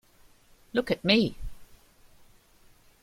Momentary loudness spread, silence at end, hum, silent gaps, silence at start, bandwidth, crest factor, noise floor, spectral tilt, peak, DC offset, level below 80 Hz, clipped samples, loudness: 23 LU; 1.4 s; none; none; 0.75 s; 15.5 kHz; 24 dB; -59 dBFS; -6 dB/octave; -6 dBFS; under 0.1%; -50 dBFS; under 0.1%; -26 LUFS